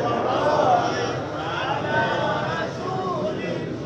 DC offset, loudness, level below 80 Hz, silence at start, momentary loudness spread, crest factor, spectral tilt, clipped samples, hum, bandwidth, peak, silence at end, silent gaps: under 0.1%; -23 LUFS; -54 dBFS; 0 s; 8 LU; 16 dB; -5.5 dB/octave; under 0.1%; none; 8.6 kHz; -6 dBFS; 0 s; none